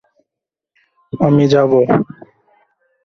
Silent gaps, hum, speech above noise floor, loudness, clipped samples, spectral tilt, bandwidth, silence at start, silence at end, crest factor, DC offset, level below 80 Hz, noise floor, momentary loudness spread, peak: none; none; 72 dB; -13 LUFS; under 0.1%; -8 dB/octave; 7.2 kHz; 1.15 s; 1.05 s; 16 dB; under 0.1%; -54 dBFS; -83 dBFS; 14 LU; -2 dBFS